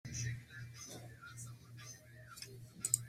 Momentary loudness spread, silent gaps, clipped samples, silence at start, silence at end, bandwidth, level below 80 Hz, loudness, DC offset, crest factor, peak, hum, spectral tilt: 10 LU; none; under 0.1%; 0.05 s; 0 s; 16 kHz; -68 dBFS; -47 LUFS; under 0.1%; 34 dB; -12 dBFS; none; -2.5 dB/octave